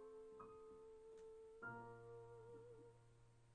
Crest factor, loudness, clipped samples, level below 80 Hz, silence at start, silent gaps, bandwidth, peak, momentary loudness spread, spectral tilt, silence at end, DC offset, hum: 16 dB; -60 LUFS; under 0.1%; -80 dBFS; 0 s; none; 9.6 kHz; -44 dBFS; 7 LU; -7 dB/octave; 0 s; under 0.1%; none